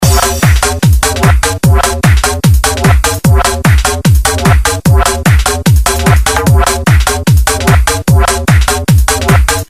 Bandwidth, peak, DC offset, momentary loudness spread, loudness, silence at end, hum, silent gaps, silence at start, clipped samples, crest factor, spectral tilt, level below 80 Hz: 16 kHz; 0 dBFS; under 0.1%; 1 LU; -9 LUFS; 0.05 s; none; none; 0 s; 0.8%; 8 dB; -4.5 dB/octave; -12 dBFS